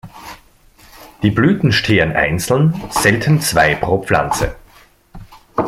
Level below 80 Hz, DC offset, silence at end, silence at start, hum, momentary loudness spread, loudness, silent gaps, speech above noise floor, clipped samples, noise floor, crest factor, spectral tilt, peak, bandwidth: -36 dBFS; under 0.1%; 0 s; 0.05 s; none; 11 LU; -15 LUFS; none; 33 dB; under 0.1%; -47 dBFS; 16 dB; -5 dB/octave; 0 dBFS; 15.5 kHz